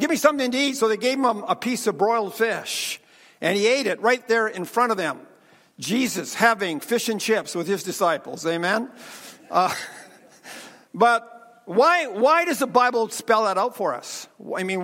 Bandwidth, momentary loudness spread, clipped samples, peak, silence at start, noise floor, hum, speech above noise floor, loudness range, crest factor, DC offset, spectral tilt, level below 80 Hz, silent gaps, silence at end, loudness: 16.5 kHz; 15 LU; under 0.1%; -2 dBFS; 0 s; -55 dBFS; none; 32 dB; 4 LU; 22 dB; under 0.1%; -3.5 dB/octave; -74 dBFS; none; 0 s; -22 LUFS